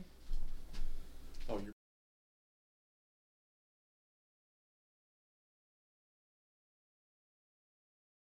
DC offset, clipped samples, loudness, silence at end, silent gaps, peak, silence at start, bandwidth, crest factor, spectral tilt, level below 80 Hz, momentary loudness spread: under 0.1%; under 0.1%; -49 LUFS; 6.65 s; none; -26 dBFS; 0 s; 6.4 kHz; 18 dB; -6 dB/octave; -46 dBFS; 11 LU